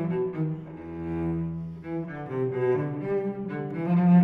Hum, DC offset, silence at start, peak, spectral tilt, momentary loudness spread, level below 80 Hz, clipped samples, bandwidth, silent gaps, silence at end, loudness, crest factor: none; under 0.1%; 0 s; -10 dBFS; -11.5 dB/octave; 9 LU; -58 dBFS; under 0.1%; 3.7 kHz; none; 0 s; -29 LUFS; 16 dB